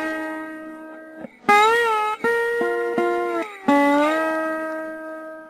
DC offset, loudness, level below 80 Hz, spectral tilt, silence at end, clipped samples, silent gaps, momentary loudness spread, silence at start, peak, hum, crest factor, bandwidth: under 0.1%; -20 LUFS; -62 dBFS; -3.5 dB/octave; 0 s; under 0.1%; none; 19 LU; 0 s; -4 dBFS; none; 18 dB; 14 kHz